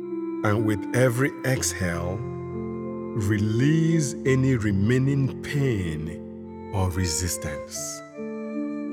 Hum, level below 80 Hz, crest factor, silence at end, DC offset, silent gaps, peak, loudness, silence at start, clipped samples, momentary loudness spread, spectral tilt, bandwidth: none; -48 dBFS; 16 dB; 0 s; under 0.1%; none; -8 dBFS; -25 LUFS; 0 s; under 0.1%; 11 LU; -5.5 dB/octave; 16.5 kHz